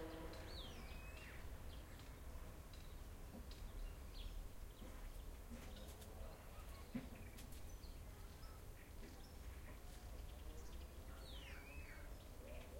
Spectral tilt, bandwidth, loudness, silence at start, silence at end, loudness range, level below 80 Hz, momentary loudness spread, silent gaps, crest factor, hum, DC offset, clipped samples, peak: -5 dB/octave; 16.5 kHz; -57 LUFS; 0 s; 0 s; 2 LU; -56 dBFS; 5 LU; none; 18 dB; none; under 0.1%; under 0.1%; -36 dBFS